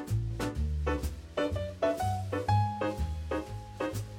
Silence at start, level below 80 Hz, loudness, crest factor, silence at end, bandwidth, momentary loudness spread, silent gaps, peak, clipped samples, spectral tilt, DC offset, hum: 0 s; -40 dBFS; -33 LUFS; 16 dB; 0 s; 17 kHz; 7 LU; none; -16 dBFS; under 0.1%; -6.5 dB/octave; under 0.1%; none